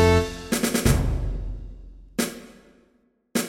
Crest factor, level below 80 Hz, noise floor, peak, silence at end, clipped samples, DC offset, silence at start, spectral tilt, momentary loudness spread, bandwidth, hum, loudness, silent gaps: 20 dB; -32 dBFS; -65 dBFS; -4 dBFS; 0 s; under 0.1%; under 0.1%; 0 s; -5 dB/octave; 18 LU; 16.5 kHz; none; -25 LUFS; none